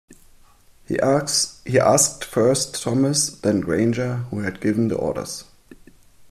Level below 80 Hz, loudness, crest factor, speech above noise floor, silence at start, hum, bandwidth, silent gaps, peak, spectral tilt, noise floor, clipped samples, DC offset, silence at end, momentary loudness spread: -52 dBFS; -20 LUFS; 18 dB; 31 dB; 0.1 s; none; 15 kHz; none; -4 dBFS; -4 dB/octave; -51 dBFS; under 0.1%; under 0.1%; 0.05 s; 10 LU